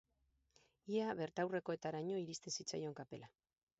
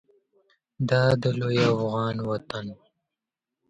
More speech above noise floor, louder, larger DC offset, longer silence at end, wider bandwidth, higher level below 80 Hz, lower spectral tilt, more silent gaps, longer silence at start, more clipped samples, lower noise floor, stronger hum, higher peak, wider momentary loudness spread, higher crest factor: second, 38 dB vs 63 dB; second, -43 LUFS vs -25 LUFS; neither; second, 0.5 s vs 0.95 s; second, 7.6 kHz vs 8.8 kHz; second, -82 dBFS vs -58 dBFS; second, -4.5 dB/octave vs -7 dB/octave; neither; about the same, 0.85 s vs 0.8 s; neither; second, -82 dBFS vs -87 dBFS; neither; second, -28 dBFS vs -8 dBFS; about the same, 12 LU vs 14 LU; about the same, 18 dB vs 18 dB